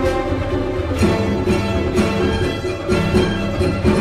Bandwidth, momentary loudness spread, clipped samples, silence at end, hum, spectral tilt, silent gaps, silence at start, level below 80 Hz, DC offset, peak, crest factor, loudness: 15 kHz; 4 LU; under 0.1%; 0 s; none; -6.5 dB/octave; none; 0 s; -28 dBFS; under 0.1%; -6 dBFS; 12 dB; -19 LUFS